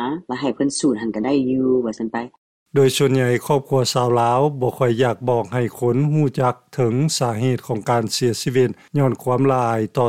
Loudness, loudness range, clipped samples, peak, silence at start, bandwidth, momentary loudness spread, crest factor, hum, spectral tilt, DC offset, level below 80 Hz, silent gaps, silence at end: -19 LUFS; 2 LU; under 0.1%; -6 dBFS; 0 s; 16 kHz; 6 LU; 14 dB; none; -6 dB/octave; 0.2%; -58 dBFS; 2.38-2.66 s; 0 s